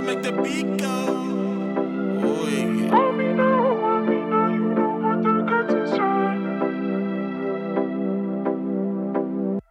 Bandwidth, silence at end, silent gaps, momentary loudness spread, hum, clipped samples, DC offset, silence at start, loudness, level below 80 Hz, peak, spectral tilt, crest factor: 14.5 kHz; 0.1 s; none; 6 LU; none; under 0.1%; under 0.1%; 0 s; -23 LUFS; -72 dBFS; -6 dBFS; -6.5 dB/octave; 16 dB